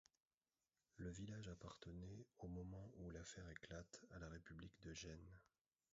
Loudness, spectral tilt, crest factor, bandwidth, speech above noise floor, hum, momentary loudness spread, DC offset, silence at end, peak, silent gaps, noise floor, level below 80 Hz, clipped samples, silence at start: -57 LUFS; -5.5 dB/octave; 18 dB; 7.6 kHz; over 33 dB; none; 5 LU; under 0.1%; 0.5 s; -40 dBFS; none; under -90 dBFS; -68 dBFS; under 0.1%; 0.95 s